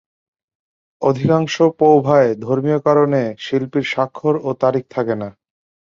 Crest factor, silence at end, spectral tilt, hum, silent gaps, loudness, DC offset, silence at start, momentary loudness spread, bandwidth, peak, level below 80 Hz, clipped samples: 16 dB; 0.65 s; -7 dB/octave; none; none; -17 LUFS; under 0.1%; 1 s; 9 LU; 7.4 kHz; -2 dBFS; -58 dBFS; under 0.1%